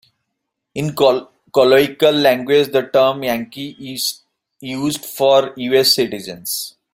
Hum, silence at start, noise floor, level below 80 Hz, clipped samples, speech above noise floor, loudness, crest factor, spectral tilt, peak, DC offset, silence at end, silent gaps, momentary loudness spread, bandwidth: none; 0.75 s; -77 dBFS; -58 dBFS; under 0.1%; 61 dB; -16 LUFS; 16 dB; -3.5 dB/octave; -2 dBFS; under 0.1%; 0.25 s; none; 15 LU; 16.5 kHz